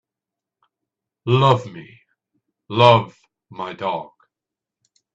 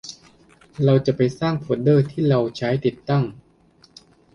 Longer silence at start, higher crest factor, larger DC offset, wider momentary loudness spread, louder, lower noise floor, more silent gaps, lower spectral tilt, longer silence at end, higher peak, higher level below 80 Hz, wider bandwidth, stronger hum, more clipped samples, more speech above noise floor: first, 1.25 s vs 0.05 s; about the same, 22 dB vs 18 dB; neither; first, 23 LU vs 7 LU; first, -18 LUFS vs -21 LUFS; first, -87 dBFS vs -55 dBFS; neither; about the same, -7 dB/octave vs -8 dB/octave; about the same, 1.1 s vs 1 s; first, 0 dBFS vs -4 dBFS; about the same, -58 dBFS vs -54 dBFS; about the same, 8 kHz vs 7.4 kHz; neither; neither; first, 70 dB vs 36 dB